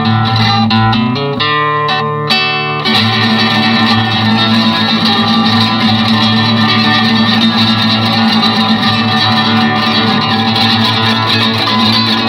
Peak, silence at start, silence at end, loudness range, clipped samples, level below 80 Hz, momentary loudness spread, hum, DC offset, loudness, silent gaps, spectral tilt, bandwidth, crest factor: 0 dBFS; 0 s; 0 s; 2 LU; under 0.1%; -44 dBFS; 3 LU; none; under 0.1%; -9 LUFS; none; -5.5 dB/octave; 16 kHz; 10 dB